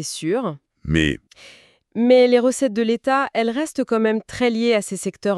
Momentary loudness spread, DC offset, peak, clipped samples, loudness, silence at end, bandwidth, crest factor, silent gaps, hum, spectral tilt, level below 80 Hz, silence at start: 11 LU; under 0.1%; -4 dBFS; under 0.1%; -19 LUFS; 0 s; 13 kHz; 16 dB; none; none; -5 dB/octave; -44 dBFS; 0 s